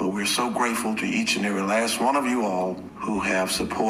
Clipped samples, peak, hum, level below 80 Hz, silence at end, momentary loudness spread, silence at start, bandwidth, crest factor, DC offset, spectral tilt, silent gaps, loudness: under 0.1%; -10 dBFS; none; -54 dBFS; 0 s; 5 LU; 0 s; 15.5 kHz; 14 dB; under 0.1%; -3.5 dB/octave; none; -24 LUFS